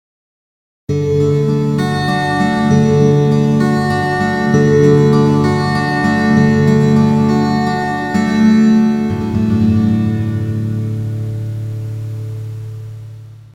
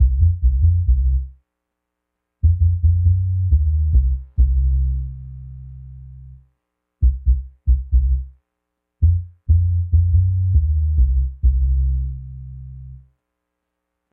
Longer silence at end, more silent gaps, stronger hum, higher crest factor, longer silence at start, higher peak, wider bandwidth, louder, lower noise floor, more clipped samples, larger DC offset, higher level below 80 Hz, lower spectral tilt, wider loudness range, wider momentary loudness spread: second, 0.15 s vs 1.15 s; neither; neither; about the same, 14 dB vs 12 dB; first, 0.9 s vs 0 s; first, 0 dBFS vs -6 dBFS; first, 11 kHz vs 0.5 kHz; first, -13 LUFS vs -19 LUFS; second, -33 dBFS vs -79 dBFS; neither; neither; second, -44 dBFS vs -20 dBFS; second, -7.5 dB/octave vs -17 dB/octave; about the same, 6 LU vs 5 LU; second, 14 LU vs 19 LU